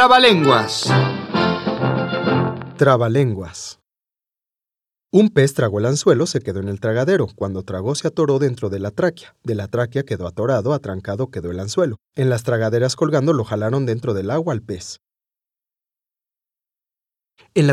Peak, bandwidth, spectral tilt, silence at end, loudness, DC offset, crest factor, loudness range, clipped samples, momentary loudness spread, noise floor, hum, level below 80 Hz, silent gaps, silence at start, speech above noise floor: 0 dBFS; 13.5 kHz; -5.5 dB/octave; 0 s; -19 LUFS; under 0.1%; 18 dB; 5 LU; under 0.1%; 11 LU; -90 dBFS; none; -58 dBFS; none; 0 s; 72 dB